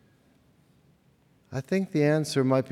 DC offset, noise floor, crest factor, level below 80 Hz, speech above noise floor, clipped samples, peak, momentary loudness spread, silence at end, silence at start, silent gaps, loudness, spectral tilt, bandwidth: under 0.1%; -63 dBFS; 16 dB; -72 dBFS; 38 dB; under 0.1%; -12 dBFS; 13 LU; 0 s; 1.5 s; none; -26 LUFS; -6.5 dB/octave; 14.5 kHz